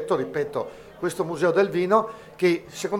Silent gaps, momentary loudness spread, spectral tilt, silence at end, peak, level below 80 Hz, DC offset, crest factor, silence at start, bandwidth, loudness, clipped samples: none; 11 LU; -5.5 dB/octave; 0 s; -4 dBFS; -62 dBFS; under 0.1%; 20 dB; 0 s; 15.5 kHz; -24 LUFS; under 0.1%